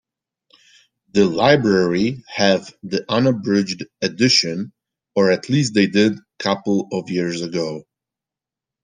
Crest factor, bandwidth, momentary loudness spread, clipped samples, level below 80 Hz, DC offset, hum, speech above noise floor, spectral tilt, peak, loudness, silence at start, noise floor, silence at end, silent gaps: 18 dB; 9.8 kHz; 11 LU; under 0.1%; -58 dBFS; under 0.1%; none; 70 dB; -5 dB/octave; -2 dBFS; -19 LUFS; 1.15 s; -88 dBFS; 1.05 s; none